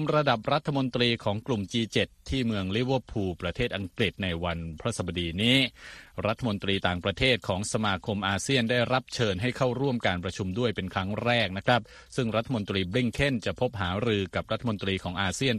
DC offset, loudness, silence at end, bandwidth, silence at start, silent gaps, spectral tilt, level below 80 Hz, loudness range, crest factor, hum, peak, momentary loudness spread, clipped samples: under 0.1%; -28 LUFS; 0 s; 13.5 kHz; 0 s; none; -5 dB/octave; -50 dBFS; 2 LU; 18 dB; none; -8 dBFS; 6 LU; under 0.1%